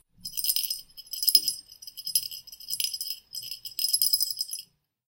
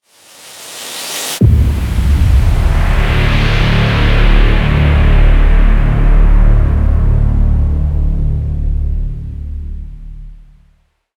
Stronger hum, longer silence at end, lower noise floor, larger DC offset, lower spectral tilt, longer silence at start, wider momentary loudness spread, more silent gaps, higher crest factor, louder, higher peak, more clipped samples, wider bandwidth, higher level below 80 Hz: neither; second, 0.45 s vs 0.8 s; second, -50 dBFS vs -54 dBFS; neither; second, 3 dB/octave vs -6 dB/octave; second, 0.25 s vs 0.45 s; about the same, 16 LU vs 14 LU; neither; first, 28 dB vs 10 dB; second, -26 LUFS vs -13 LUFS; about the same, -2 dBFS vs -2 dBFS; neither; about the same, 17.5 kHz vs 16 kHz; second, -68 dBFS vs -12 dBFS